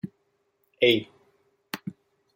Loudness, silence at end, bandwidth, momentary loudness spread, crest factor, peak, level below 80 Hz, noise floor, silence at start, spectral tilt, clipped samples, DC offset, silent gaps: -25 LUFS; 0.45 s; 16.5 kHz; 20 LU; 24 dB; -6 dBFS; -72 dBFS; -72 dBFS; 0.05 s; -5 dB/octave; under 0.1%; under 0.1%; none